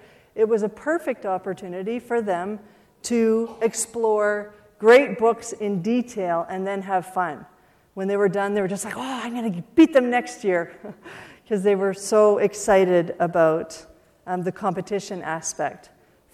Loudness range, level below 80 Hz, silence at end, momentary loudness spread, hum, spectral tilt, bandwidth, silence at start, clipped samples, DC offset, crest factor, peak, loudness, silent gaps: 5 LU; -62 dBFS; 0.55 s; 14 LU; none; -5 dB/octave; 14.5 kHz; 0.35 s; under 0.1%; under 0.1%; 18 dB; -4 dBFS; -22 LUFS; none